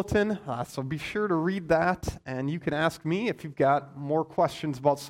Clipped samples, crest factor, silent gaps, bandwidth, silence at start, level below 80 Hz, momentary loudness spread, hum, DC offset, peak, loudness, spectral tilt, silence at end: under 0.1%; 18 dB; none; 16 kHz; 0 s; -50 dBFS; 8 LU; none; under 0.1%; -8 dBFS; -28 LUFS; -6.5 dB/octave; 0 s